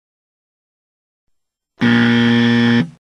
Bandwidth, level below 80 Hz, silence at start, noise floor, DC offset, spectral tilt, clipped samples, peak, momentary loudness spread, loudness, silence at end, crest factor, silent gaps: 7 kHz; -56 dBFS; 1.8 s; -69 dBFS; under 0.1%; -6.5 dB/octave; under 0.1%; -2 dBFS; 3 LU; -14 LUFS; 0.1 s; 14 dB; none